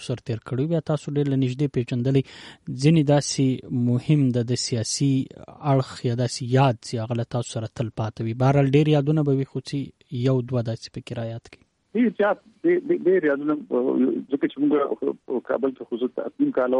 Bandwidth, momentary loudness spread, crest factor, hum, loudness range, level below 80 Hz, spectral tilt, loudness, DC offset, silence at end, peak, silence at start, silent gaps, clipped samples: 11.5 kHz; 11 LU; 16 dB; none; 3 LU; -58 dBFS; -6.5 dB/octave; -23 LUFS; under 0.1%; 0 s; -6 dBFS; 0 s; none; under 0.1%